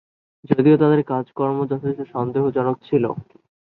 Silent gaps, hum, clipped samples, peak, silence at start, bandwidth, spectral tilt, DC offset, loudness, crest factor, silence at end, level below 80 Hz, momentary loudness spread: none; none; under 0.1%; -2 dBFS; 0.5 s; 4.3 kHz; -11.5 dB/octave; under 0.1%; -20 LUFS; 18 dB; 0.4 s; -60 dBFS; 10 LU